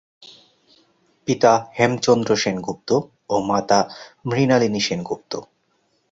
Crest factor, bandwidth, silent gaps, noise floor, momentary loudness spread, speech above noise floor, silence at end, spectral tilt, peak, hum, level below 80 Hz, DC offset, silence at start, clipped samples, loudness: 20 dB; 7.8 kHz; none; -66 dBFS; 12 LU; 47 dB; 0.7 s; -5 dB/octave; -2 dBFS; none; -58 dBFS; under 0.1%; 0.2 s; under 0.1%; -20 LUFS